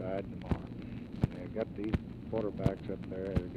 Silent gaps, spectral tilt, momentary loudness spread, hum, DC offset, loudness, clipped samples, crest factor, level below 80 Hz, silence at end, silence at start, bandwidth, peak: none; -9 dB/octave; 6 LU; none; under 0.1%; -37 LUFS; under 0.1%; 22 dB; -46 dBFS; 0 s; 0 s; 11 kHz; -14 dBFS